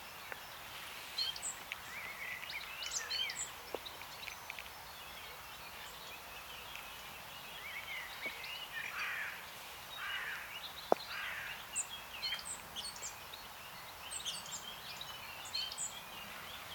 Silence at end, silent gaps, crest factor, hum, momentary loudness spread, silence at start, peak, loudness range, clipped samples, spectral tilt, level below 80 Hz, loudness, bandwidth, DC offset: 0 s; none; 34 dB; none; 10 LU; 0 s; -12 dBFS; 6 LU; under 0.1%; -0.5 dB/octave; -68 dBFS; -42 LUFS; 19 kHz; under 0.1%